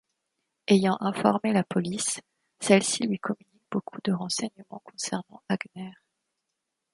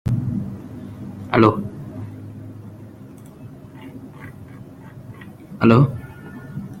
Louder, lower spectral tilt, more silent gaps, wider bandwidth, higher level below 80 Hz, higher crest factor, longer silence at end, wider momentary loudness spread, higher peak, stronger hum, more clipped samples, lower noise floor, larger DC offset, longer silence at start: second, -27 LUFS vs -19 LUFS; second, -4.5 dB/octave vs -9 dB/octave; neither; second, 11.5 kHz vs 13.5 kHz; second, -70 dBFS vs -48 dBFS; about the same, 24 dB vs 22 dB; first, 1 s vs 0 s; second, 16 LU vs 24 LU; second, -6 dBFS vs -2 dBFS; neither; neither; first, -83 dBFS vs -40 dBFS; neither; first, 0.7 s vs 0.05 s